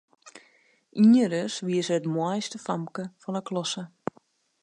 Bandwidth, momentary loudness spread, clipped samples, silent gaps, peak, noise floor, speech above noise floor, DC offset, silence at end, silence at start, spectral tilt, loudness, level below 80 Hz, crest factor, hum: 10.5 kHz; 18 LU; under 0.1%; none; -10 dBFS; -63 dBFS; 38 dB; under 0.1%; 0.75 s; 0.25 s; -5.5 dB/octave; -26 LUFS; -76 dBFS; 16 dB; none